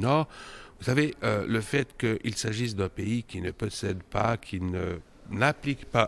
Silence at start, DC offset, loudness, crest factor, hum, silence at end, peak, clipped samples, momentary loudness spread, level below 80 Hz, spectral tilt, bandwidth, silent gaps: 0 s; under 0.1%; -29 LUFS; 22 dB; none; 0 s; -6 dBFS; under 0.1%; 10 LU; -52 dBFS; -5.5 dB/octave; 12 kHz; none